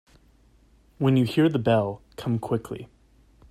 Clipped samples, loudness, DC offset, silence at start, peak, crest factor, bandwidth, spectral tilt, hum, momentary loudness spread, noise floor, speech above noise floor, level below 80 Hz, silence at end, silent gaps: under 0.1%; -24 LUFS; under 0.1%; 1 s; -8 dBFS; 18 dB; 14 kHz; -8 dB/octave; none; 13 LU; -58 dBFS; 35 dB; -56 dBFS; 0.65 s; none